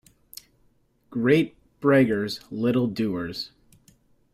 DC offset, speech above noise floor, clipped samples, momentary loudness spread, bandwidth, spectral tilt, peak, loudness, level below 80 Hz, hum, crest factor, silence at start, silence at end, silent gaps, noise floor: under 0.1%; 41 dB; under 0.1%; 24 LU; 15.5 kHz; -7 dB/octave; -6 dBFS; -24 LUFS; -60 dBFS; none; 20 dB; 1.1 s; 0.85 s; none; -64 dBFS